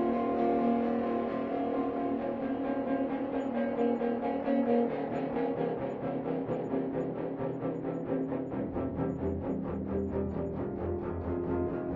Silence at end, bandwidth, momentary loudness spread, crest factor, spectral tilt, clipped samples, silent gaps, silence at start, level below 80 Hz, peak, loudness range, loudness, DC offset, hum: 0 s; 4.8 kHz; 6 LU; 16 dB; -8 dB/octave; under 0.1%; none; 0 s; -56 dBFS; -16 dBFS; 3 LU; -33 LUFS; under 0.1%; none